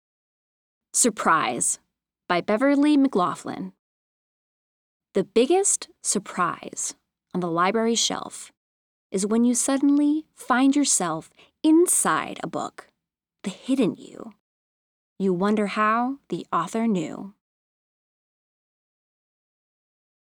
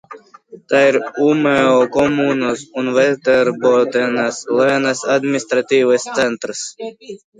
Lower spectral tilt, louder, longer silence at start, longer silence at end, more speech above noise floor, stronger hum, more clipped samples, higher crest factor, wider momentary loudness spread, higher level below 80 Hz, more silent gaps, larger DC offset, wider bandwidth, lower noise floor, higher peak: about the same, -3.5 dB/octave vs -4.5 dB/octave; second, -23 LUFS vs -15 LUFS; first, 0.95 s vs 0.1 s; first, 3.1 s vs 0.25 s; first, 61 dB vs 26 dB; neither; neither; about the same, 18 dB vs 16 dB; first, 15 LU vs 9 LU; second, -72 dBFS vs -58 dBFS; first, 3.79-5.00 s, 8.57-9.10 s, 14.40-15.16 s vs none; neither; first, 20 kHz vs 9.6 kHz; first, -84 dBFS vs -41 dBFS; second, -6 dBFS vs 0 dBFS